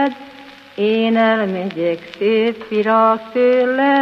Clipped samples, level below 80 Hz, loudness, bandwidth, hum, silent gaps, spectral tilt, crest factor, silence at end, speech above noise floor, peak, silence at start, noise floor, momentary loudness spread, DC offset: under 0.1%; -68 dBFS; -16 LUFS; 6.4 kHz; none; none; -7 dB/octave; 14 dB; 0 s; 24 dB; -2 dBFS; 0 s; -39 dBFS; 7 LU; under 0.1%